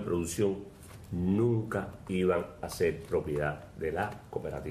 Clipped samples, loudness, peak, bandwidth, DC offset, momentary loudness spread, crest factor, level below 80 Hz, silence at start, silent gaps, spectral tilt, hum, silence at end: under 0.1%; -32 LUFS; -16 dBFS; 14.5 kHz; under 0.1%; 11 LU; 16 dB; -52 dBFS; 0 s; none; -6.5 dB/octave; none; 0 s